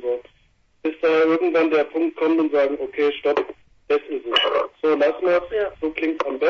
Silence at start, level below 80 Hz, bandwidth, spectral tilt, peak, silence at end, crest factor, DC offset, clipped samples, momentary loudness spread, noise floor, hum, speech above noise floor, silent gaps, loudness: 0 s; -58 dBFS; 6.8 kHz; -5 dB/octave; -4 dBFS; 0 s; 16 dB; under 0.1%; under 0.1%; 7 LU; -60 dBFS; none; 40 dB; none; -21 LUFS